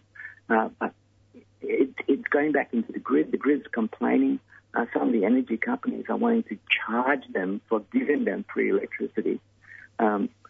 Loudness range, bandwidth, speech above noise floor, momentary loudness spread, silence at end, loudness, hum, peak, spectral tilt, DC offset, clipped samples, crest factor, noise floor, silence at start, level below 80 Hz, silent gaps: 2 LU; 3.8 kHz; 29 dB; 8 LU; 0.2 s; -26 LUFS; none; -8 dBFS; -8 dB/octave; under 0.1%; under 0.1%; 18 dB; -55 dBFS; 0.15 s; -72 dBFS; none